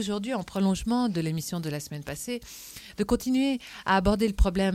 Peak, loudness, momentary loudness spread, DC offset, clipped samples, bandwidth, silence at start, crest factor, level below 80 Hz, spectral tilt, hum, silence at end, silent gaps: -10 dBFS; -28 LUFS; 11 LU; under 0.1%; under 0.1%; 16 kHz; 0 s; 18 dB; -36 dBFS; -5.5 dB/octave; none; 0 s; none